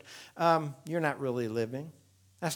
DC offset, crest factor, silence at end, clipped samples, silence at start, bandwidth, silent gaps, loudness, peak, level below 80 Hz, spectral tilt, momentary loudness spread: under 0.1%; 22 dB; 0 s; under 0.1%; 0.05 s; 19.5 kHz; none; -32 LUFS; -12 dBFS; -80 dBFS; -5.5 dB/octave; 15 LU